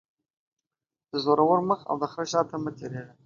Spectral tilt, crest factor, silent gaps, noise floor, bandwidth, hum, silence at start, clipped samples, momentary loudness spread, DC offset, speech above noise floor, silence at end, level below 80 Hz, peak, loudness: -5.5 dB/octave; 20 dB; none; under -90 dBFS; 7.4 kHz; none; 1.15 s; under 0.1%; 13 LU; under 0.1%; over 64 dB; 0.2 s; -70 dBFS; -8 dBFS; -26 LUFS